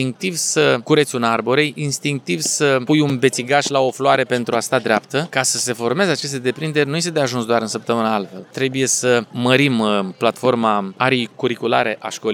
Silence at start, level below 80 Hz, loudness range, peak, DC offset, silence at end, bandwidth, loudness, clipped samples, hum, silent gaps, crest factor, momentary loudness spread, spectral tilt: 0 s; -70 dBFS; 2 LU; 0 dBFS; under 0.1%; 0 s; 18.5 kHz; -18 LUFS; under 0.1%; none; none; 18 dB; 6 LU; -4 dB/octave